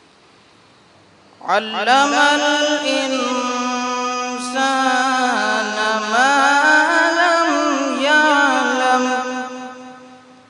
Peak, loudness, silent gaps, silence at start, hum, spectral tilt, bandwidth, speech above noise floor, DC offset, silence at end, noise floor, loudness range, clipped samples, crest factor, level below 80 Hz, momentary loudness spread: 0 dBFS; -16 LUFS; none; 1.45 s; none; -1.5 dB/octave; 11 kHz; 33 dB; under 0.1%; 0.3 s; -50 dBFS; 4 LU; under 0.1%; 18 dB; -70 dBFS; 9 LU